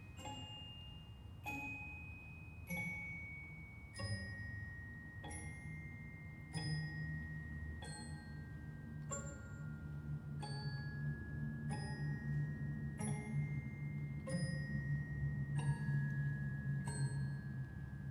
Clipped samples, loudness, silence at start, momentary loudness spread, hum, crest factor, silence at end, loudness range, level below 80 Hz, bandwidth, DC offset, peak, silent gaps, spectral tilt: under 0.1%; -45 LUFS; 0 s; 10 LU; none; 16 dB; 0 s; 7 LU; -58 dBFS; 12.5 kHz; under 0.1%; -28 dBFS; none; -6 dB/octave